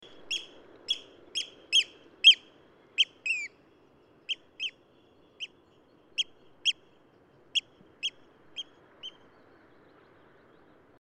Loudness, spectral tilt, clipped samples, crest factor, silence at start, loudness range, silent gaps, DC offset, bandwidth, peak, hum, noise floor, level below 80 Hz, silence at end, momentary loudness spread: -27 LUFS; 2 dB/octave; under 0.1%; 26 dB; 0.25 s; 13 LU; none; under 0.1%; 12 kHz; -8 dBFS; none; -61 dBFS; -80 dBFS; 1.9 s; 22 LU